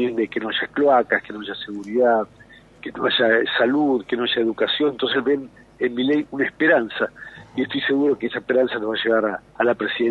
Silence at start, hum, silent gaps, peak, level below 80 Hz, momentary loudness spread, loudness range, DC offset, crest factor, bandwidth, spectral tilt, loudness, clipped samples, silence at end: 0 s; none; none; -4 dBFS; -60 dBFS; 10 LU; 2 LU; under 0.1%; 16 dB; 7 kHz; -6 dB/octave; -21 LUFS; under 0.1%; 0 s